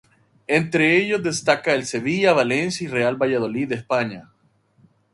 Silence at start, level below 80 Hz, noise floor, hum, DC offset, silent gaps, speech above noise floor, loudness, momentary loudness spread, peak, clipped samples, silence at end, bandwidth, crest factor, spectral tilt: 0.5 s; -62 dBFS; -61 dBFS; none; under 0.1%; none; 41 dB; -20 LUFS; 8 LU; -2 dBFS; under 0.1%; 0.9 s; 11.5 kHz; 20 dB; -4.5 dB/octave